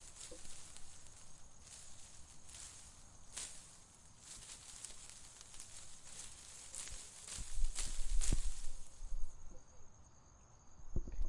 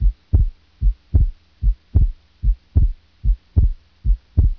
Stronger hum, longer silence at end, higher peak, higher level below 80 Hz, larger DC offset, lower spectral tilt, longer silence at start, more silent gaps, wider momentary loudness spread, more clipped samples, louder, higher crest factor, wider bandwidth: neither; about the same, 0 s vs 0.05 s; second, -20 dBFS vs -2 dBFS; second, -46 dBFS vs -18 dBFS; neither; second, -2.5 dB/octave vs -11.5 dB/octave; about the same, 0 s vs 0 s; neither; first, 18 LU vs 5 LU; neither; second, -49 LUFS vs -22 LUFS; about the same, 20 dB vs 16 dB; first, 11.5 kHz vs 1.1 kHz